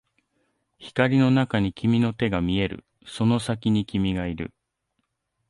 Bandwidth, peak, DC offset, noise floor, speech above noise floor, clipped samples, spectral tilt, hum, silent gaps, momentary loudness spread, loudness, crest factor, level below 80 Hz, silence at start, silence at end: 11.5 kHz; -6 dBFS; under 0.1%; -77 dBFS; 54 dB; under 0.1%; -7 dB/octave; none; none; 12 LU; -24 LUFS; 20 dB; -46 dBFS; 0.8 s; 1 s